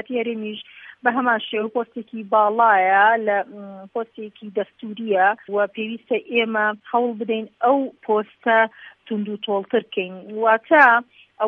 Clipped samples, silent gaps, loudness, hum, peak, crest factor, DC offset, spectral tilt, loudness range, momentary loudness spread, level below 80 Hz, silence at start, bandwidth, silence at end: under 0.1%; none; -20 LUFS; none; -2 dBFS; 20 dB; under 0.1%; -7 dB/octave; 4 LU; 16 LU; -78 dBFS; 0.1 s; 5.8 kHz; 0 s